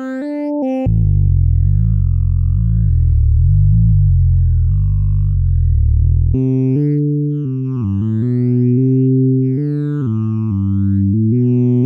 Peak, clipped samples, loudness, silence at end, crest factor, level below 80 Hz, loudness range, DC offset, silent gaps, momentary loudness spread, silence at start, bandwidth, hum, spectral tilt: -4 dBFS; under 0.1%; -15 LUFS; 0 s; 10 dB; -18 dBFS; 2 LU; under 0.1%; none; 6 LU; 0 s; 2.8 kHz; none; -12.5 dB/octave